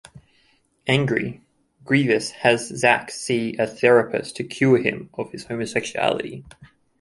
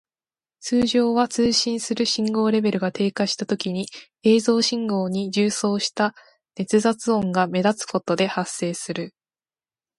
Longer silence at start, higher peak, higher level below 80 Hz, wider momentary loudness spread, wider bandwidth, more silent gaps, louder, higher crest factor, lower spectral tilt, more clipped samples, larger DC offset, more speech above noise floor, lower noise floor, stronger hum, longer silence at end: second, 0.15 s vs 0.6 s; first, -2 dBFS vs -6 dBFS; about the same, -60 dBFS vs -62 dBFS; first, 14 LU vs 9 LU; about the same, 11.5 kHz vs 11.5 kHz; neither; about the same, -21 LUFS vs -22 LUFS; about the same, 20 dB vs 16 dB; about the same, -5 dB/octave vs -4.5 dB/octave; neither; neither; second, 41 dB vs over 68 dB; second, -62 dBFS vs under -90 dBFS; neither; second, 0.35 s vs 0.9 s